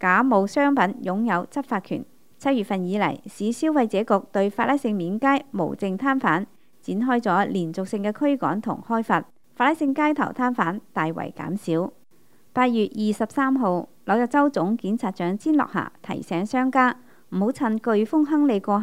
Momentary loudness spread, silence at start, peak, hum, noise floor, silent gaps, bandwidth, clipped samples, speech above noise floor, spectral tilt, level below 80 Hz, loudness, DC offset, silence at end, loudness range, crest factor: 8 LU; 0 s; -4 dBFS; none; -61 dBFS; none; 15.5 kHz; under 0.1%; 38 dB; -6.5 dB/octave; -70 dBFS; -23 LUFS; 0.3%; 0 s; 2 LU; 18 dB